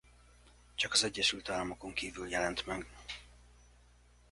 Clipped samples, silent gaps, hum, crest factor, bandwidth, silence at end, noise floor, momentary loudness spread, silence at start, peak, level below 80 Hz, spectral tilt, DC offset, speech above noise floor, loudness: under 0.1%; none; 60 Hz at -55 dBFS; 24 dB; 11.5 kHz; 0.8 s; -63 dBFS; 17 LU; 0.45 s; -14 dBFS; -58 dBFS; -1.5 dB/octave; under 0.1%; 27 dB; -34 LUFS